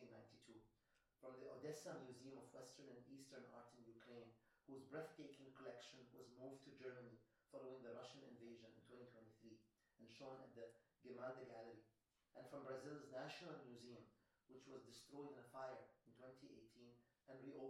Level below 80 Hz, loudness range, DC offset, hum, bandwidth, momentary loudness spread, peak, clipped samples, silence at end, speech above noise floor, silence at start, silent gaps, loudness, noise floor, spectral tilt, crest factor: under -90 dBFS; 4 LU; under 0.1%; none; 13 kHz; 12 LU; -40 dBFS; under 0.1%; 0 s; 26 dB; 0 s; none; -60 LUFS; -85 dBFS; -5 dB/octave; 20 dB